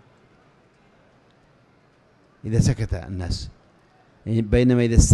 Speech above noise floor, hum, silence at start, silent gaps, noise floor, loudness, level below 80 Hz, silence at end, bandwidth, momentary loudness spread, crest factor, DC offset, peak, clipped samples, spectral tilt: 39 dB; none; 2.45 s; none; -58 dBFS; -22 LUFS; -30 dBFS; 0 s; 12 kHz; 19 LU; 22 dB; under 0.1%; 0 dBFS; under 0.1%; -6 dB/octave